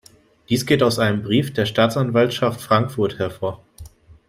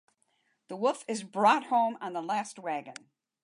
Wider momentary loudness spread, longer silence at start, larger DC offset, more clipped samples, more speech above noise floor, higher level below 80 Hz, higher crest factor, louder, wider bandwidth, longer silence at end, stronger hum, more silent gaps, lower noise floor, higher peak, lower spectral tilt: second, 8 LU vs 16 LU; second, 0.5 s vs 0.7 s; neither; neither; second, 23 dB vs 45 dB; first, -52 dBFS vs -88 dBFS; about the same, 18 dB vs 20 dB; first, -20 LUFS vs -30 LUFS; first, 16 kHz vs 11.5 kHz; second, 0.15 s vs 0.5 s; neither; neither; second, -42 dBFS vs -74 dBFS; first, -2 dBFS vs -10 dBFS; first, -5.5 dB/octave vs -4 dB/octave